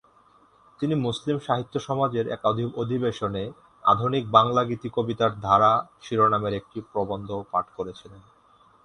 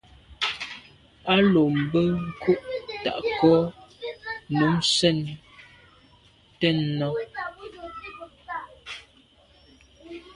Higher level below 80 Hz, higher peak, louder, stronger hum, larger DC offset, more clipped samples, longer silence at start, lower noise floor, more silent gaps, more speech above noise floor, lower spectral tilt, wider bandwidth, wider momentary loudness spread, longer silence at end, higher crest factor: about the same, -56 dBFS vs -56 dBFS; first, -2 dBFS vs -6 dBFS; about the same, -25 LUFS vs -24 LUFS; neither; neither; neither; first, 0.8 s vs 0.3 s; about the same, -58 dBFS vs -57 dBFS; neither; about the same, 33 dB vs 35 dB; first, -7 dB/octave vs -5.5 dB/octave; about the same, 10.5 kHz vs 11.5 kHz; second, 13 LU vs 20 LU; first, 0.65 s vs 0.05 s; about the same, 24 dB vs 22 dB